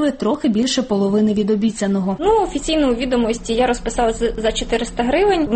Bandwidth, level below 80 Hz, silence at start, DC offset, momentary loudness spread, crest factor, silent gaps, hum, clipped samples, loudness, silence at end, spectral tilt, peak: 8.8 kHz; -34 dBFS; 0 s; under 0.1%; 3 LU; 12 dB; none; none; under 0.1%; -18 LUFS; 0 s; -5 dB/octave; -6 dBFS